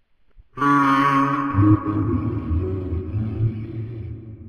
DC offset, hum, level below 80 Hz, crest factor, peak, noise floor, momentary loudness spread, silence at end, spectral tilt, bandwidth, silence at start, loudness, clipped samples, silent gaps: under 0.1%; none; -38 dBFS; 16 dB; -6 dBFS; -52 dBFS; 15 LU; 0 s; -8 dB/octave; 9.4 kHz; 0.35 s; -21 LUFS; under 0.1%; none